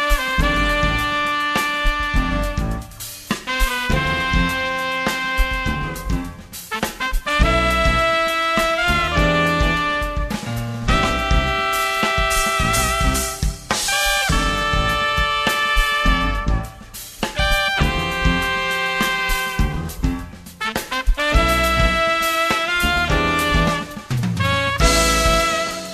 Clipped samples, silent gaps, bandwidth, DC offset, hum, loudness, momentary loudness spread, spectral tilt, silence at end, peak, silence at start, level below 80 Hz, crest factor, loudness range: under 0.1%; none; 14 kHz; under 0.1%; none; -19 LUFS; 9 LU; -3.5 dB/octave; 0 s; -2 dBFS; 0 s; -24 dBFS; 18 dB; 3 LU